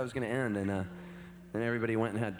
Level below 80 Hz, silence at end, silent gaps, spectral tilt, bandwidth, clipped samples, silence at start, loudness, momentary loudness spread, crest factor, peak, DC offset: -64 dBFS; 0 s; none; -7 dB/octave; over 20 kHz; under 0.1%; 0 s; -34 LUFS; 16 LU; 18 dB; -16 dBFS; under 0.1%